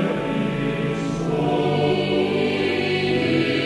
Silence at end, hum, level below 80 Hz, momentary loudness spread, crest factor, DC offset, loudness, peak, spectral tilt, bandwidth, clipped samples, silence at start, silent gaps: 0 s; none; -48 dBFS; 4 LU; 14 dB; under 0.1%; -21 LUFS; -8 dBFS; -6.5 dB/octave; 11.5 kHz; under 0.1%; 0 s; none